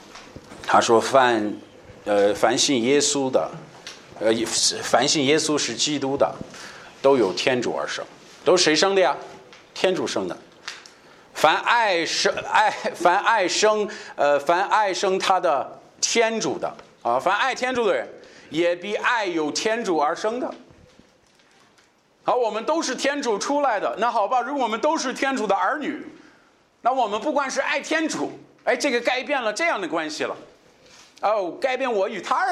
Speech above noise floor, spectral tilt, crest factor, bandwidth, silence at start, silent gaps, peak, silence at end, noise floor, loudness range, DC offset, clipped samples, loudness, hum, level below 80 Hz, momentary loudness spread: 37 dB; -2.5 dB/octave; 22 dB; 14.5 kHz; 0 s; none; 0 dBFS; 0 s; -59 dBFS; 5 LU; under 0.1%; under 0.1%; -22 LUFS; none; -66 dBFS; 14 LU